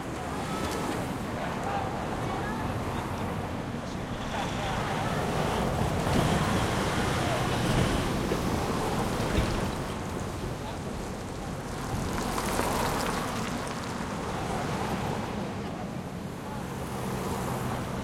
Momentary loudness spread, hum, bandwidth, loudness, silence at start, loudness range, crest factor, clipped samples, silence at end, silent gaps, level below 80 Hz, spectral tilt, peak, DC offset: 8 LU; none; 16.5 kHz; -31 LUFS; 0 s; 6 LU; 20 dB; under 0.1%; 0 s; none; -42 dBFS; -5 dB/octave; -12 dBFS; under 0.1%